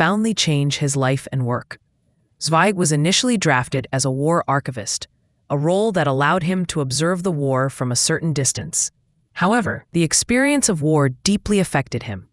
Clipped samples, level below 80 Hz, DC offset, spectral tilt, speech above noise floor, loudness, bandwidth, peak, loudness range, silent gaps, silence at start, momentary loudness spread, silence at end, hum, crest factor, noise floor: under 0.1%; -50 dBFS; under 0.1%; -4 dB/octave; 44 dB; -19 LUFS; 12 kHz; 0 dBFS; 2 LU; none; 0 s; 8 LU; 0.1 s; none; 18 dB; -63 dBFS